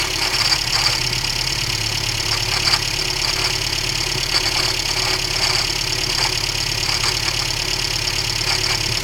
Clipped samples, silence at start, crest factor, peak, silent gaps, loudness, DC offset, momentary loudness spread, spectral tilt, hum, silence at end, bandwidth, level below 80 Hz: under 0.1%; 0 s; 16 dB; -2 dBFS; none; -17 LUFS; under 0.1%; 3 LU; -1.5 dB/octave; none; 0 s; 18 kHz; -34 dBFS